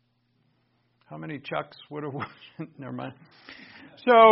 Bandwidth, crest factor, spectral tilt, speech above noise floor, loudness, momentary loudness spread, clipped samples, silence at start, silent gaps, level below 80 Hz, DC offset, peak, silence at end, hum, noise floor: 5.8 kHz; 22 dB; -3 dB/octave; 45 dB; -28 LUFS; 20 LU; under 0.1%; 1.1 s; none; -72 dBFS; under 0.1%; -4 dBFS; 0 s; none; -70 dBFS